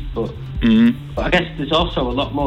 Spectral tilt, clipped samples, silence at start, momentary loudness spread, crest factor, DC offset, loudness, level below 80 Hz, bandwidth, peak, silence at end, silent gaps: -7 dB/octave; under 0.1%; 0 s; 12 LU; 14 dB; under 0.1%; -18 LUFS; -30 dBFS; 8.2 kHz; -4 dBFS; 0 s; none